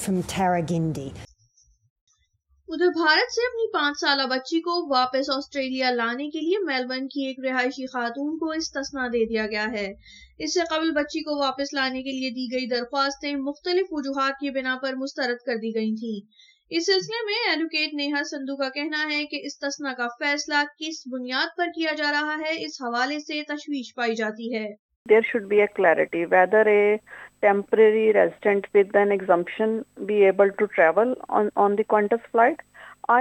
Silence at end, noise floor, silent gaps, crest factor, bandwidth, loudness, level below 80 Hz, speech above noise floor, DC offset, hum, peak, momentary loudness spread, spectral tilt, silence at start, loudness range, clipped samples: 0 s; -66 dBFS; 1.90-2.07 s, 24.79-24.89 s, 24.96-25.05 s; 18 dB; 12.5 kHz; -24 LUFS; -62 dBFS; 43 dB; under 0.1%; none; -6 dBFS; 10 LU; -4 dB/octave; 0 s; 7 LU; under 0.1%